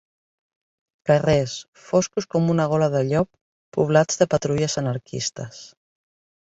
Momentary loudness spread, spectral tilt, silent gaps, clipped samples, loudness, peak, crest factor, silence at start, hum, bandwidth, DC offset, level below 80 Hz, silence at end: 12 LU; -5.5 dB/octave; 1.68-1.73 s, 3.41-3.72 s; under 0.1%; -22 LUFS; -2 dBFS; 20 dB; 1.05 s; none; 8 kHz; under 0.1%; -54 dBFS; 0.8 s